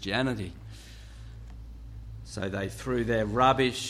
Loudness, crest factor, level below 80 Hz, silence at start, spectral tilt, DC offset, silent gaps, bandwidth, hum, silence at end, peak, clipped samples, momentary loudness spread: -28 LUFS; 22 dB; -46 dBFS; 0 s; -5 dB/octave; under 0.1%; none; 14.5 kHz; none; 0 s; -10 dBFS; under 0.1%; 23 LU